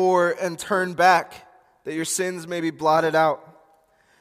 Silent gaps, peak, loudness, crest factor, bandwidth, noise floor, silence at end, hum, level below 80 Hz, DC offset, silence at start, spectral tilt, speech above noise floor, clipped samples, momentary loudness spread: none; -4 dBFS; -22 LUFS; 20 dB; 15.5 kHz; -60 dBFS; 0.8 s; none; -68 dBFS; under 0.1%; 0 s; -4 dB/octave; 39 dB; under 0.1%; 14 LU